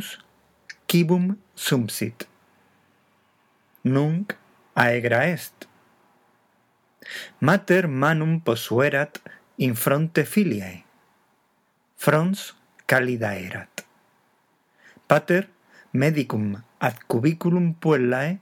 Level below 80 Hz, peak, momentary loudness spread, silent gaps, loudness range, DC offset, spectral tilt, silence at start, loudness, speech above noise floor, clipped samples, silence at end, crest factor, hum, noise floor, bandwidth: -76 dBFS; 0 dBFS; 17 LU; none; 4 LU; under 0.1%; -6 dB/octave; 0 s; -23 LUFS; 45 dB; under 0.1%; 0.05 s; 24 dB; none; -67 dBFS; 19.5 kHz